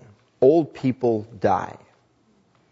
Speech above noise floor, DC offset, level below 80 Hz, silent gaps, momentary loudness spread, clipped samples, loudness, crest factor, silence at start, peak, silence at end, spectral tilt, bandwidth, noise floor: 41 dB; under 0.1%; -62 dBFS; none; 8 LU; under 0.1%; -21 LUFS; 18 dB; 0.4 s; -6 dBFS; 1 s; -8.5 dB/octave; 7.6 kHz; -62 dBFS